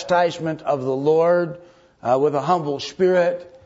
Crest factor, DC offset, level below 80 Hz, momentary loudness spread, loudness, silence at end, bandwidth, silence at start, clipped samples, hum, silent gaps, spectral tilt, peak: 14 dB; under 0.1%; -62 dBFS; 9 LU; -20 LUFS; 0.15 s; 8 kHz; 0 s; under 0.1%; none; none; -6 dB/octave; -6 dBFS